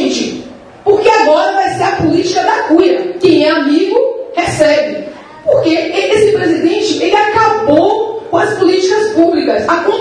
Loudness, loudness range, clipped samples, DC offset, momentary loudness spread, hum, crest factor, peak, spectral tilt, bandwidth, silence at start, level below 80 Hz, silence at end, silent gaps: -11 LUFS; 2 LU; 0.2%; under 0.1%; 7 LU; none; 10 dB; 0 dBFS; -4.5 dB/octave; 10.5 kHz; 0 s; -48 dBFS; 0 s; none